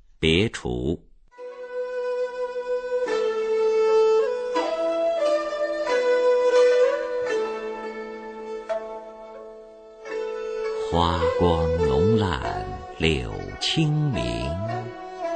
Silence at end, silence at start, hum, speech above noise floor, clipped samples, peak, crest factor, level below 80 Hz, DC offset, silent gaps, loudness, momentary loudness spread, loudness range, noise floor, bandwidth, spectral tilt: 0 s; 0.2 s; none; 21 dB; under 0.1%; -6 dBFS; 18 dB; -42 dBFS; under 0.1%; none; -24 LUFS; 16 LU; 8 LU; -44 dBFS; 9 kHz; -6 dB/octave